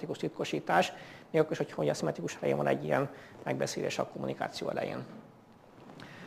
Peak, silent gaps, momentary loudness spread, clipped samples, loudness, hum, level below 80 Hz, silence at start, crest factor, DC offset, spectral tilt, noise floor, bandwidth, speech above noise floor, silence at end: -12 dBFS; none; 17 LU; under 0.1%; -33 LUFS; none; -72 dBFS; 0 s; 22 dB; under 0.1%; -5 dB/octave; -57 dBFS; 15.5 kHz; 24 dB; 0 s